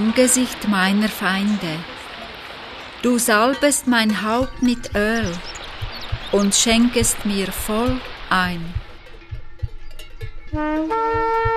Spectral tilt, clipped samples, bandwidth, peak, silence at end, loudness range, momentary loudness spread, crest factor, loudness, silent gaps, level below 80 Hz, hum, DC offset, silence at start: -3.5 dB/octave; under 0.1%; 14 kHz; -2 dBFS; 0 s; 6 LU; 18 LU; 18 dB; -19 LUFS; none; -36 dBFS; none; under 0.1%; 0 s